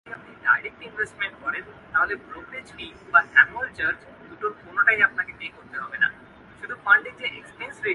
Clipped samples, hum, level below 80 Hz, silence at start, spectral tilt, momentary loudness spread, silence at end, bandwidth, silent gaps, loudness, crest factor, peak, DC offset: under 0.1%; none; -60 dBFS; 0.05 s; -3.5 dB/octave; 19 LU; 0 s; 11 kHz; none; -23 LUFS; 24 dB; 0 dBFS; under 0.1%